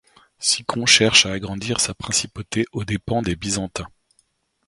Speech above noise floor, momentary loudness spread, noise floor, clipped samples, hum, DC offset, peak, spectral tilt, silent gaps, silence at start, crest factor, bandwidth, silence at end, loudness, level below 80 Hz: 44 dB; 13 LU; -65 dBFS; under 0.1%; none; under 0.1%; 0 dBFS; -2.5 dB/octave; none; 0.4 s; 22 dB; 16 kHz; 0.8 s; -19 LUFS; -46 dBFS